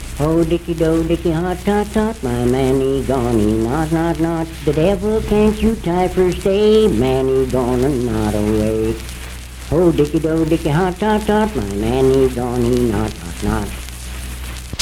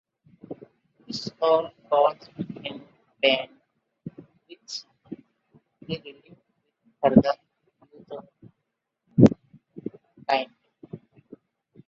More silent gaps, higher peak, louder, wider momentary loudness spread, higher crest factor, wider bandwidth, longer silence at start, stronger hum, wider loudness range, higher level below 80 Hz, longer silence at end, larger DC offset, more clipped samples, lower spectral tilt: neither; about the same, -2 dBFS vs 0 dBFS; first, -17 LUFS vs -24 LUFS; second, 10 LU vs 25 LU; second, 14 dB vs 26 dB; first, 16.5 kHz vs 7.6 kHz; second, 0 s vs 0.5 s; neither; second, 2 LU vs 7 LU; first, -28 dBFS vs -58 dBFS; second, 0 s vs 0.9 s; neither; neither; about the same, -6.5 dB/octave vs -7 dB/octave